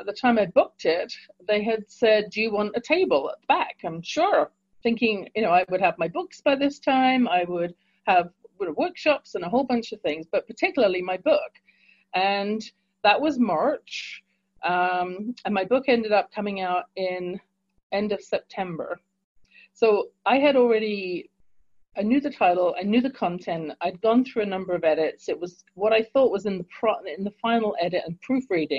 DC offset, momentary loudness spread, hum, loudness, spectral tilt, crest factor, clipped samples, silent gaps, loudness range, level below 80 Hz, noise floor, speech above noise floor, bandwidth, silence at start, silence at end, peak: under 0.1%; 11 LU; none; -24 LUFS; -5.5 dB/octave; 18 dB; under 0.1%; 17.83-17.90 s, 19.24-19.35 s; 3 LU; -66 dBFS; -63 dBFS; 40 dB; 7.6 kHz; 0 s; 0 s; -6 dBFS